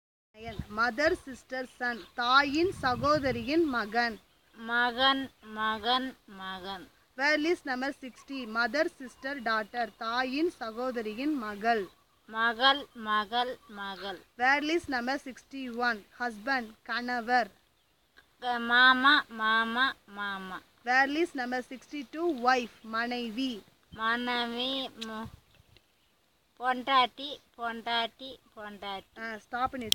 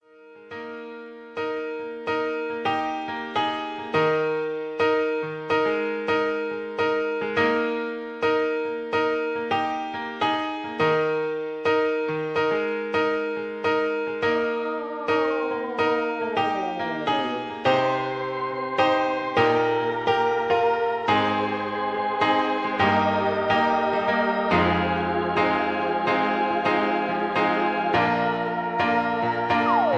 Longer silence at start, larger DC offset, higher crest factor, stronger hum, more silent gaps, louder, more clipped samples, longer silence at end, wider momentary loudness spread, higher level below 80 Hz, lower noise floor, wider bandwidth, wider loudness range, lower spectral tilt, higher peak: first, 0.35 s vs 0.2 s; neither; first, 30 dB vs 16 dB; neither; neither; second, -30 LUFS vs -24 LUFS; neither; about the same, 0.05 s vs 0 s; first, 16 LU vs 7 LU; about the same, -62 dBFS vs -58 dBFS; first, -70 dBFS vs -48 dBFS; first, 17 kHz vs 8 kHz; first, 6 LU vs 3 LU; second, -3.5 dB/octave vs -6 dB/octave; first, -2 dBFS vs -8 dBFS